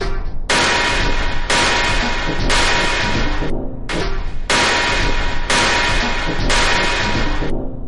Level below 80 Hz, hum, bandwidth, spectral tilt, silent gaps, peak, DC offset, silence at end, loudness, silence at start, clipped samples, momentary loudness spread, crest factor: -22 dBFS; none; 11.5 kHz; -3 dB/octave; none; -6 dBFS; under 0.1%; 0 s; -17 LUFS; 0 s; under 0.1%; 10 LU; 10 dB